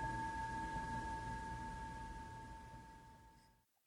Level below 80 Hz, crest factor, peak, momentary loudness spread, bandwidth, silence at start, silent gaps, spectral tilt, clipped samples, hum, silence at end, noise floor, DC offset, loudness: -56 dBFS; 14 dB; -32 dBFS; 17 LU; 18 kHz; 0 s; none; -5 dB/octave; under 0.1%; none; 0.35 s; -71 dBFS; under 0.1%; -47 LUFS